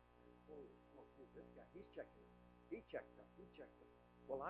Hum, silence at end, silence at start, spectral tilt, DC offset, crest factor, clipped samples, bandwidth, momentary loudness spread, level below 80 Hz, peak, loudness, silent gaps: 60 Hz at -70 dBFS; 0 s; 0 s; -5 dB/octave; under 0.1%; 22 dB; under 0.1%; 4.5 kHz; 16 LU; -76 dBFS; -34 dBFS; -59 LUFS; none